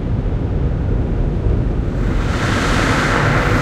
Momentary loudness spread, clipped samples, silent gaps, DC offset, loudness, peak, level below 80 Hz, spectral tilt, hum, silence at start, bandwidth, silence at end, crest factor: 5 LU; under 0.1%; none; under 0.1%; -18 LUFS; -2 dBFS; -20 dBFS; -6 dB/octave; none; 0 s; 13 kHz; 0 s; 14 dB